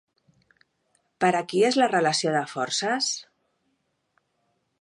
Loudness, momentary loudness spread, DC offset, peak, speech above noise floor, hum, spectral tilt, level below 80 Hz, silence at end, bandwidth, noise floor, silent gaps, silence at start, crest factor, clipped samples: -24 LUFS; 6 LU; under 0.1%; -6 dBFS; 50 dB; none; -3 dB/octave; -78 dBFS; 1.6 s; 11 kHz; -74 dBFS; none; 1.2 s; 20 dB; under 0.1%